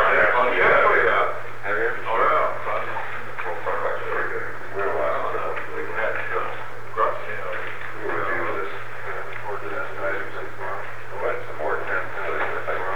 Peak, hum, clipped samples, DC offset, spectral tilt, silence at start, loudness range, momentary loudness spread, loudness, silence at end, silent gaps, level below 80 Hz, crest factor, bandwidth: -6 dBFS; none; under 0.1%; 6%; -5.5 dB/octave; 0 s; 8 LU; 14 LU; -24 LUFS; 0 s; none; -54 dBFS; 18 dB; over 20 kHz